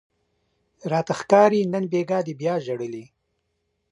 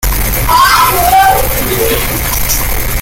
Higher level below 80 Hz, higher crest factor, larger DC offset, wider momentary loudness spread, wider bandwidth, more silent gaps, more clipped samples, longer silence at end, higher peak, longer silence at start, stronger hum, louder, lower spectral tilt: second, -70 dBFS vs -18 dBFS; first, 22 dB vs 10 dB; neither; first, 16 LU vs 6 LU; second, 11 kHz vs 17.5 kHz; neither; neither; first, 0.85 s vs 0 s; about the same, -2 dBFS vs 0 dBFS; first, 0.85 s vs 0 s; neither; second, -22 LUFS vs -9 LUFS; first, -6.5 dB/octave vs -2.5 dB/octave